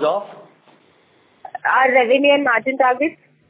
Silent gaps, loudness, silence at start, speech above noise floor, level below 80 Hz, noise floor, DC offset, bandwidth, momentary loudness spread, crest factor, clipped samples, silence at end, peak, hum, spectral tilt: none; -16 LUFS; 0 s; 40 dB; -68 dBFS; -56 dBFS; under 0.1%; 4 kHz; 12 LU; 16 dB; under 0.1%; 0.35 s; -2 dBFS; none; -7 dB/octave